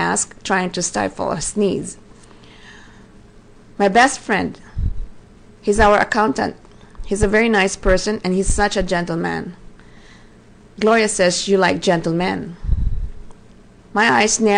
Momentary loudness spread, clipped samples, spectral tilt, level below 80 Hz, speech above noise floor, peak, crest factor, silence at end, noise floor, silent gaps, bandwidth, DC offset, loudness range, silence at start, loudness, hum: 13 LU; under 0.1%; -4 dB/octave; -30 dBFS; 28 dB; -2 dBFS; 18 dB; 0 s; -45 dBFS; none; 10 kHz; under 0.1%; 4 LU; 0 s; -18 LUFS; none